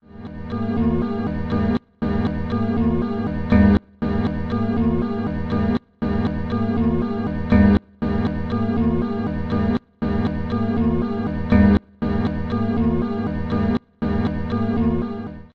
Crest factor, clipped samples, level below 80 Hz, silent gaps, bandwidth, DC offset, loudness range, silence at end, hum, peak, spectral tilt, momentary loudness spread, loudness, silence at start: 18 dB; under 0.1%; -32 dBFS; none; 5.6 kHz; under 0.1%; 2 LU; 0.05 s; none; -2 dBFS; -10 dB/octave; 8 LU; -21 LUFS; 0.05 s